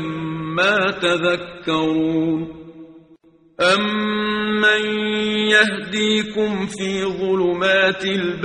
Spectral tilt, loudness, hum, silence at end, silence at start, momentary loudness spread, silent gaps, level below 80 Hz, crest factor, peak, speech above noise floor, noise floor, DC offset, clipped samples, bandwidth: -4.5 dB/octave; -18 LUFS; none; 0 s; 0 s; 8 LU; none; -54 dBFS; 18 dB; -2 dBFS; 33 dB; -51 dBFS; under 0.1%; under 0.1%; 10.5 kHz